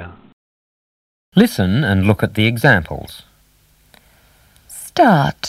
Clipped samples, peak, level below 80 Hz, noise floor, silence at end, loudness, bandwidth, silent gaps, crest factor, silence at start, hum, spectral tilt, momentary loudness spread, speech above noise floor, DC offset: under 0.1%; 0 dBFS; -44 dBFS; -54 dBFS; 0 s; -15 LUFS; 16 kHz; 0.33-1.32 s; 18 dB; 0 s; none; -6 dB/octave; 21 LU; 40 dB; under 0.1%